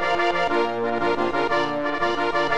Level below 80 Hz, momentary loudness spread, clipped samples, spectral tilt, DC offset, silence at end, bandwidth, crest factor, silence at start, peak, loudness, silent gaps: -52 dBFS; 2 LU; under 0.1%; -4.5 dB/octave; 2%; 0 s; 10 kHz; 14 dB; 0 s; -10 dBFS; -22 LUFS; none